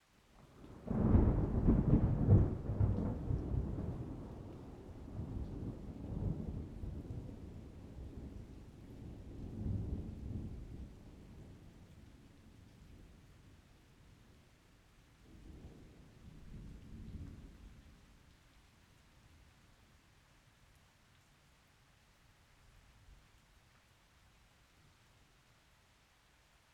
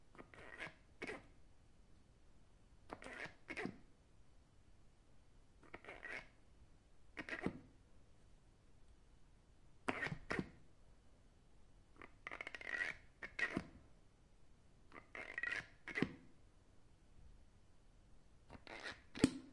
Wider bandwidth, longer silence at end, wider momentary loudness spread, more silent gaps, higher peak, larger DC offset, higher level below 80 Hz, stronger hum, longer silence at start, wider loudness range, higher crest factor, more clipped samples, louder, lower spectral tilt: second, 8.6 kHz vs 11 kHz; first, 3.6 s vs 0 s; first, 29 LU vs 19 LU; neither; about the same, -16 dBFS vs -16 dBFS; neither; first, -46 dBFS vs -68 dBFS; neither; first, 0.4 s vs 0 s; first, 27 LU vs 7 LU; second, 24 dB vs 34 dB; neither; first, -38 LUFS vs -47 LUFS; first, -10 dB/octave vs -5 dB/octave